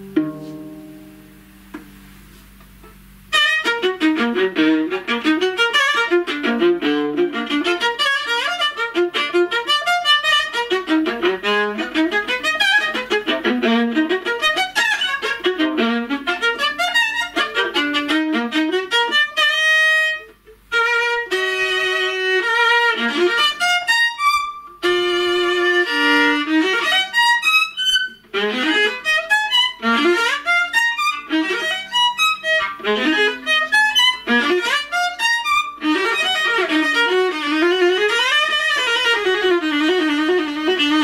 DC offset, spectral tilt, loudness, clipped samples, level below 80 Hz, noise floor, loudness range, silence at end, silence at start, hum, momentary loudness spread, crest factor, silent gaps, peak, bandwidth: under 0.1%; -2 dB/octave; -17 LUFS; under 0.1%; -56 dBFS; -44 dBFS; 3 LU; 0 s; 0 s; none; 6 LU; 16 dB; none; -4 dBFS; 16 kHz